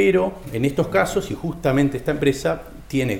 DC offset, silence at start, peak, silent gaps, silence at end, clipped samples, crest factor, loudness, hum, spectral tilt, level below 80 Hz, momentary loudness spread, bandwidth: under 0.1%; 0 s; -4 dBFS; none; 0 s; under 0.1%; 16 dB; -22 LUFS; none; -6 dB/octave; -42 dBFS; 6 LU; 17 kHz